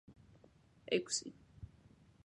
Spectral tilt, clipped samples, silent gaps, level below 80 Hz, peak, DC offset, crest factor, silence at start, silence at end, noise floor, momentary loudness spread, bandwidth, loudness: -2.5 dB/octave; under 0.1%; none; -68 dBFS; -20 dBFS; under 0.1%; 24 dB; 0.1 s; 0.6 s; -66 dBFS; 21 LU; 11 kHz; -38 LUFS